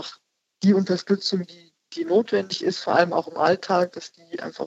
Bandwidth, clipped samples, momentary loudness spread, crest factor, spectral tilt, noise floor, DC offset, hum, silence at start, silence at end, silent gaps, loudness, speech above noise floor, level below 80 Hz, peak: 8 kHz; under 0.1%; 16 LU; 20 dB; -5.5 dB/octave; -54 dBFS; under 0.1%; none; 0 s; 0 s; none; -23 LUFS; 31 dB; -74 dBFS; -4 dBFS